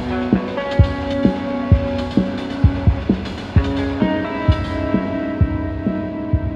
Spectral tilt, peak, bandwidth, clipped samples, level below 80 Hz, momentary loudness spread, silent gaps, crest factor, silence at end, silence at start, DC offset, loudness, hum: -8.5 dB/octave; 0 dBFS; 7.6 kHz; under 0.1%; -26 dBFS; 5 LU; none; 18 dB; 0 s; 0 s; under 0.1%; -19 LUFS; none